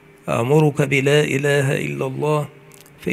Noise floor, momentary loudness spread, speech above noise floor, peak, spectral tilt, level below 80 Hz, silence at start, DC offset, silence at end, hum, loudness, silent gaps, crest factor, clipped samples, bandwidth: -44 dBFS; 9 LU; 26 dB; -2 dBFS; -6 dB/octave; -56 dBFS; 0.25 s; under 0.1%; 0 s; none; -18 LUFS; none; 16 dB; under 0.1%; 15 kHz